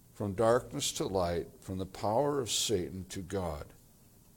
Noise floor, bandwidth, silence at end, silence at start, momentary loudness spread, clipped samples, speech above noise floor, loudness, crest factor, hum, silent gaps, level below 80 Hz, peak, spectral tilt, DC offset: -60 dBFS; 18.5 kHz; 0.6 s; 0.15 s; 12 LU; under 0.1%; 27 dB; -33 LUFS; 20 dB; none; none; -58 dBFS; -14 dBFS; -4 dB/octave; under 0.1%